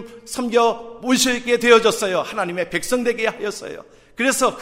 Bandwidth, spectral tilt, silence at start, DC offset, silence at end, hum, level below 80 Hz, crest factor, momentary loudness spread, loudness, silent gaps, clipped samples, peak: 16 kHz; -2.5 dB/octave; 0 s; under 0.1%; 0 s; none; -52 dBFS; 20 dB; 14 LU; -19 LUFS; none; under 0.1%; 0 dBFS